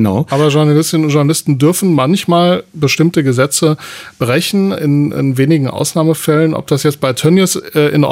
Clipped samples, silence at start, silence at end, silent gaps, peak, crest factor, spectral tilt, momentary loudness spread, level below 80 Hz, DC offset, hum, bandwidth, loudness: under 0.1%; 0 s; 0 s; none; 0 dBFS; 10 dB; -5.5 dB/octave; 4 LU; -54 dBFS; under 0.1%; none; 16 kHz; -12 LUFS